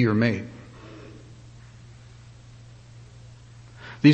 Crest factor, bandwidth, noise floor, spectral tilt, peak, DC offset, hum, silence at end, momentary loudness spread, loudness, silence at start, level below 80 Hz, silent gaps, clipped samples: 24 dB; 8.6 kHz; -47 dBFS; -7.5 dB/octave; -4 dBFS; under 0.1%; none; 0 s; 25 LU; -24 LUFS; 0 s; -56 dBFS; none; under 0.1%